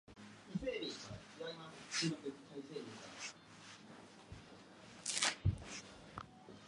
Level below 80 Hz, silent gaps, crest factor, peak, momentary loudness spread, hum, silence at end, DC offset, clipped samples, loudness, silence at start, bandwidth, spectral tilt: -60 dBFS; none; 32 dB; -14 dBFS; 21 LU; none; 0 s; under 0.1%; under 0.1%; -43 LUFS; 0.1 s; 11.5 kHz; -3.5 dB/octave